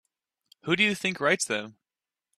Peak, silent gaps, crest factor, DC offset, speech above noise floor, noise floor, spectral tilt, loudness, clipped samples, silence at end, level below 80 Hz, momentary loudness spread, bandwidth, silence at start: -8 dBFS; none; 22 dB; under 0.1%; over 63 dB; under -90 dBFS; -3 dB/octave; -25 LUFS; under 0.1%; 0.7 s; -72 dBFS; 15 LU; 14.5 kHz; 0.65 s